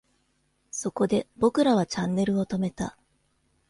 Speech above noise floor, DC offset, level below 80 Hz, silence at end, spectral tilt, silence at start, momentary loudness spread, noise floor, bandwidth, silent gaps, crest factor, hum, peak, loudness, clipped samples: 46 dB; under 0.1%; -58 dBFS; 0.8 s; -6 dB/octave; 0.75 s; 12 LU; -70 dBFS; 11.5 kHz; none; 18 dB; none; -10 dBFS; -26 LUFS; under 0.1%